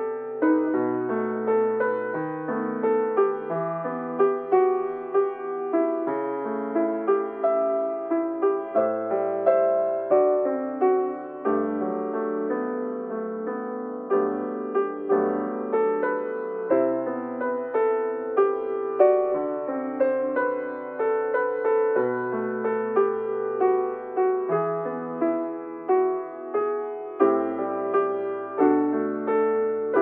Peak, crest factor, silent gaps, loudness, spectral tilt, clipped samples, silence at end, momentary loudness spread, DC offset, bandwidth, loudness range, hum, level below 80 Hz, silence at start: -6 dBFS; 18 dB; none; -25 LUFS; -7 dB/octave; under 0.1%; 0 s; 8 LU; under 0.1%; 3.4 kHz; 3 LU; none; -74 dBFS; 0 s